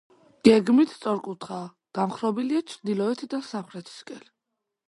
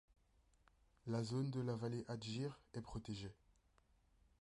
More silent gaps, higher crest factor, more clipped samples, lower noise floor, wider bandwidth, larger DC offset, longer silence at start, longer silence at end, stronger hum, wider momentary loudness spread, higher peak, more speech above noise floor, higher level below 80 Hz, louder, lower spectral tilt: neither; first, 24 dB vs 16 dB; neither; first, -83 dBFS vs -76 dBFS; about the same, 11.5 kHz vs 11 kHz; neither; second, 0.45 s vs 1.05 s; second, 0.7 s vs 1.1 s; neither; first, 21 LU vs 10 LU; first, -2 dBFS vs -30 dBFS; first, 58 dB vs 31 dB; about the same, -66 dBFS vs -68 dBFS; first, -25 LUFS vs -46 LUFS; about the same, -6 dB/octave vs -6.5 dB/octave